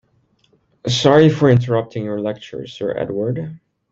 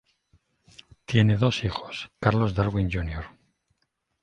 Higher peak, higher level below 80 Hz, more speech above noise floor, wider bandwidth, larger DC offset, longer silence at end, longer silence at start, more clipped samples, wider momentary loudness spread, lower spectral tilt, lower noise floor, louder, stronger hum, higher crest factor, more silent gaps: about the same, -2 dBFS vs -4 dBFS; second, -54 dBFS vs -42 dBFS; second, 44 dB vs 52 dB; about the same, 8 kHz vs 8.8 kHz; neither; second, 0.35 s vs 0.95 s; second, 0.85 s vs 1.1 s; neither; about the same, 17 LU vs 16 LU; about the same, -6.5 dB/octave vs -7 dB/octave; second, -60 dBFS vs -76 dBFS; first, -17 LUFS vs -25 LUFS; neither; about the same, 18 dB vs 22 dB; neither